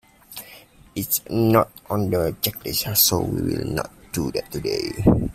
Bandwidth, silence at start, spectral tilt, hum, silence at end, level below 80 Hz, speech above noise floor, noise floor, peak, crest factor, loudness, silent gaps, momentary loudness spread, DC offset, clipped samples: 16 kHz; 0.3 s; -4.5 dB/octave; none; 0 s; -42 dBFS; 25 dB; -47 dBFS; -2 dBFS; 22 dB; -22 LUFS; none; 15 LU; under 0.1%; under 0.1%